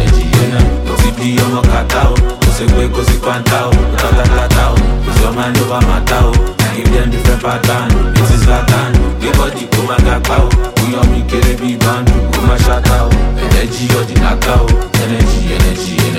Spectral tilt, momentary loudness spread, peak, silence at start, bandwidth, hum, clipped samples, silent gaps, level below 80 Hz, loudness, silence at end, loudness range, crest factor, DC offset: -5.5 dB/octave; 3 LU; 0 dBFS; 0 s; 16.5 kHz; none; under 0.1%; none; -12 dBFS; -12 LUFS; 0 s; 1 LU; 10 dB; under 0.1%